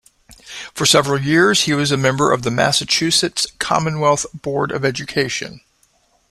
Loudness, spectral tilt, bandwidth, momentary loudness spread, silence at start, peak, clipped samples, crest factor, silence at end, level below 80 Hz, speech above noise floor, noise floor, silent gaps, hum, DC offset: -16 LUFS; -3.5 dB/octave; 15 kHz; 9 LU; 0.3 s; -2 dBFS; under 0.1%; 18 dB; 0.7 s; -50 dBFS; 42 dB; -59 dBFS; none; none; under 0.1%